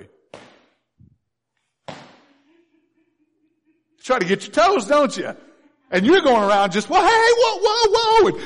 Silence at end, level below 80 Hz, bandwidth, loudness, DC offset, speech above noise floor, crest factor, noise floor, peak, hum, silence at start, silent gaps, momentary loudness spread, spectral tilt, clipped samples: 0 s; -52 dBFS; 10.5 kHz; -17 LUFS; under 0.1%; 59 dB; 14 dB; -76 dBFS; -6 dBFS; none; 0.35 s; none; 17 LU; -4 dB/octave; under 0.1%